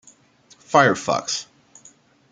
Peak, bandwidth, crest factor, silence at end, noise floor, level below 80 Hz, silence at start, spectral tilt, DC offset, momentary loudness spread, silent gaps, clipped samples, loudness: -2 dBFS; 9.6 kHz; 22 dB; 0.9 s; -55 dBFS; -66 dBFS; 0.7 s; -3.5 dB/octave; under 0.1%; 11 LU; none; under 0.1%; -20 LUFS